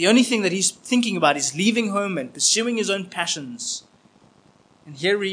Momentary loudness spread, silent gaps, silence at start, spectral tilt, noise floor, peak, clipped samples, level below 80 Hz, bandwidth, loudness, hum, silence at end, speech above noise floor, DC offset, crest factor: 9 LU; none; 0 s; -2.5 dB/octave; -56 dBFS; -2 dBFS; under 0.1%; -74 dBFS; 10.5 kHz; -21 LUFS; none; 0 s; 34 dB; under 0.1%; 20 dB